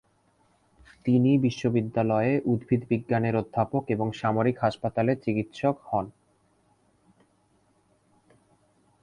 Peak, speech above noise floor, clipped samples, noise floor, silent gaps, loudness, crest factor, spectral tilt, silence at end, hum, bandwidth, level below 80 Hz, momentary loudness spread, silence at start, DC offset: -10 dBFS; 41 dB; under 0.1%; -66 dBFS; none; -26 LUFS; 18 dB; -8.5 dB/octave; 2.9 s; none; 9.8 kHz; -60 dBFS; 6 LU; 1.05 s; under 0.1%